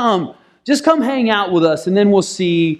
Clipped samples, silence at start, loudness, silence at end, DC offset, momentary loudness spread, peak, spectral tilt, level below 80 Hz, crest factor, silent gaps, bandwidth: under 0.1%; 0 s; -15 LUFS; 0 s; under 0.1%; 7 LU; 0 dBFS; -5.5 dB/octave; -60 dBFS; 14 dB; none; 14 kHz